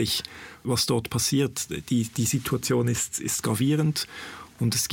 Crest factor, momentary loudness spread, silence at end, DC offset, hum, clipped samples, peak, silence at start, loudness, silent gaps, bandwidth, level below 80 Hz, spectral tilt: 16 dB; 9 LU; 0 s; under 0.1%; none; under 0.1%; -12 dBFS; 0 s; -26 LUFS; none; 17 kHz; -54 dBFS; -4 dB/octave